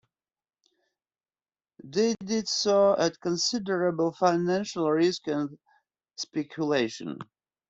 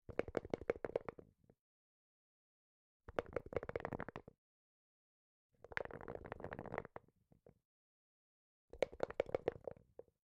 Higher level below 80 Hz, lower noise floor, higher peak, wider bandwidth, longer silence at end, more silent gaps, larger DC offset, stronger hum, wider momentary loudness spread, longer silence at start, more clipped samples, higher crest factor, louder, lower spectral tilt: about the same, -70 dBFS vs -68 dBFS; first, under -90 dBFS vs -71 dBFS; first, -10 dBFS vs -18 dBFS; second, 8 kHz vs 11.5 kHz; about the same, 0.45 s vs 0.55 s; second, none vs 1.59-3.00 s, 4.38-5.49 s, 7.65-8.68 s; neither; neither; second, 13 LU vs 16 LU; first, 1.85 s vs 0.1 s; neither; second, 18 dB vs 30 dB; first, -27 LUFS vs -46 LUFS; second, -4.5 dB/octave vs -6.5 dB/octave